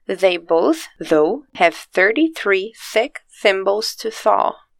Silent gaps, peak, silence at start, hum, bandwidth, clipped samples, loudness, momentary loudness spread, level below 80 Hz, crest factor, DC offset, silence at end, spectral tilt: none; 0 dBFS; 0.1 s; none; 17 kHz; under 0.1%; -18 LUFS; 5 LU; -60 dBFS; 18 dB; under 0.1%; 0.25 s; -3.5 dB/octave